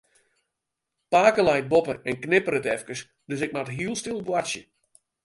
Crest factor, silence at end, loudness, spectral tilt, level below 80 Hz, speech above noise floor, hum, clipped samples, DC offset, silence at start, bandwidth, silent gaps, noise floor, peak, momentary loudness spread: 20 dB; 0.65 s; -24 LUFS; -4.5 dB/octave; -60 dBFS; 59 dB; none; under 0.1%; under 0.1%; 1.1 s; 11.5 kHz; none; -84 dBFS; -4 dBFS; 14 LU